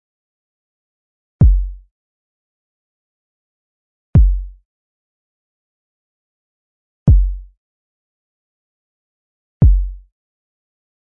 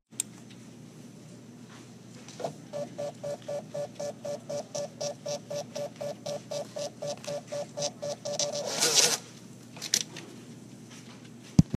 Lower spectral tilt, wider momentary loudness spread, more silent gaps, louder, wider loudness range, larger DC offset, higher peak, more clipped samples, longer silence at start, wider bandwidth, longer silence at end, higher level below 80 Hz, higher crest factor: first, -12.5 dB/octave vs -3 dB/octave; second, 16 LU vs 22 LU; first, 1.91-4.13 s, 4.65-7.06 s, 7.57-9.60 s vs none; first, -16 LUFS vs -32 LUFS; second, 3 LU vs 12 LU; neither; about the same, -2 dBFS vs -4 dBFS; neither; first, 1.4 s vs 0.1 s; second, 1.8 kHz vs 15.5 kHz; first, 1.05 s vs 0 s; first, -22 dBFS vs -56 dBFS; second, 18 dB vs 30 dB